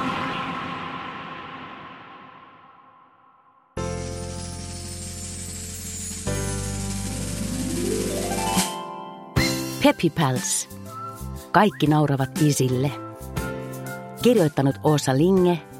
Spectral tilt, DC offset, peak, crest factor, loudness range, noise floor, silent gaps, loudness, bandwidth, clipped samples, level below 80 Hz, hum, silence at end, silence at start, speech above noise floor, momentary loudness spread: -5 dB/octave; under 0.1%; -2 dBFS; 22 dB; 14 LU; -57 dBFS; none; -24 LUFS; 16.5 kHz; under 0.1%; -44 dBFS; none; 0 s; 0 s; 37 dB; 16 LU